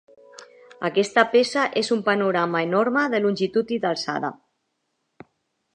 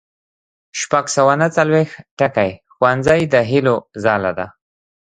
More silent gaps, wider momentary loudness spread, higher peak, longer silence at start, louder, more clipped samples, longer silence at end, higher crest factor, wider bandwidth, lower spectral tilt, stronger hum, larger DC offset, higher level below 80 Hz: second, none vs 2.11-2.17 s; about the same, 8 LU vs 10 LU; about the same, 0 dBFS vs 0 dBFS; second, 0.4 s vs 0.75 s; second, -22 LUFS vs -16 LUFS; neither; first, 1.4 s vs 0.55 s; about the same, 22 dB vs 18 dB; about the same, 10.5 kHz vs 11 kHz; about the same, -4.5 dB/octave vs -5 dB/octave; neither; neither; second, -70 dBFS vs -50 dBFS